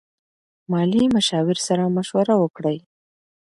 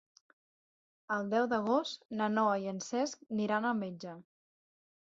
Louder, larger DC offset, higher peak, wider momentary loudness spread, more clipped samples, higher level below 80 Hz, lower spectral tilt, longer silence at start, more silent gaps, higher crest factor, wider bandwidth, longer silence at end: first, -20 LUFS vs -34 LUFS; neither; first, -6 dBFS vs -18 dBFS; second, 8 LU vs 11 LU; neither; first, -58 dBFS vs -78 dBFS; first, -5.5 dB/octave vs -4 dB/octave; second, 0.7 s vs 1.1 s; about the same, 2.50-2.54 s vs 2.05-2.09 s; about the same, 16 dB vs 18 dB; first, 11.5 kHz vs 7.6 kHz; second, 0.65 s vs 0.9 s